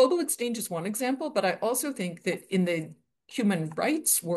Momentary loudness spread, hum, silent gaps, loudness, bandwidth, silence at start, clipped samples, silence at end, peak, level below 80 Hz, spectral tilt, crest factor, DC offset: 8 LU; none; none; -28 LUFS; 13 kHz; 0 s; under 0.1%; 0 s; -10 dBFS; -78 dBFS; -4 dB/octave; 18 dB; under 0.1%